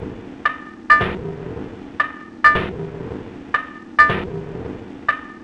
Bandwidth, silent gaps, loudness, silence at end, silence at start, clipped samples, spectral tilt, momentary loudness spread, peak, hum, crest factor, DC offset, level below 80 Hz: 11 kHz; none; -19 LUFS; 0 s; 0 s; under 0.1%; -6 dB/octave; 18 LU; 0 dBFS; none; 22 dB; under 0.1%; -42 dBFS